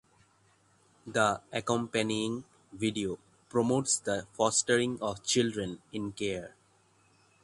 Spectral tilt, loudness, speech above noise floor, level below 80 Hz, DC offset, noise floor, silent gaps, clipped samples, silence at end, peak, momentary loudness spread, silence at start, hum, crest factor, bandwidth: -3.5 dB/octave; -31 LUFS; 36 dB; -64 dBFS; under 0.1%; -67 dBFS; none; under 0.1%; 0.95 s; -10 dBFS; 11 LU; 1.05 s; none; 22 dB; 11.5 kHz